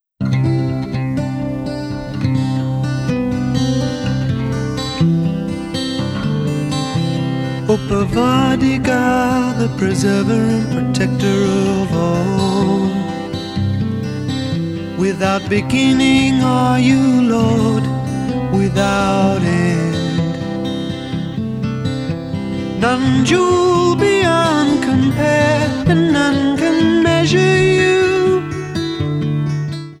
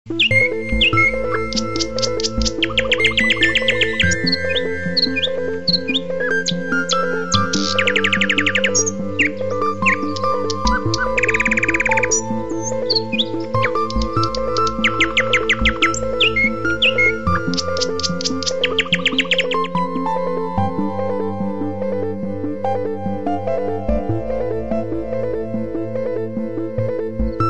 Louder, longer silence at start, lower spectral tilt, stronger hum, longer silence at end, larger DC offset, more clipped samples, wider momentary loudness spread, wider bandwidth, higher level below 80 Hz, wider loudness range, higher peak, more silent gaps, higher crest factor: about the same, -16 LUFS vs -18 LUFS; first, 0.2 s vs 0.05 s; first, -6 dB/octave vs -3.5 dB/octave; neither; about the same, 0.05 s vs 0 s; second, under 0.1% vs 4%; neither; about the same, 9 LU vs 9 LU; first, 13 kHz vs 10.5 kHz; about the same, -38 dBFS vs -34 dBFS; about the same, 5 LU vs 6 LU; about the same, 0 dBFS vs -2 dBFS; neither; about the same, 14 dB vs 18 dB